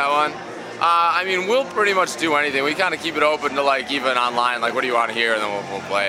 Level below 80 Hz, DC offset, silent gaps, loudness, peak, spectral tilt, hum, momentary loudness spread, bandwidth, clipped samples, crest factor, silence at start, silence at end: -64 dBFS; under 0.1%; none; -19 LUFS; -2 dBFS; -3 dB/octave; none; 5 LU; 16 kHz; under 0.1%; 18 dB; 0 s; 0 s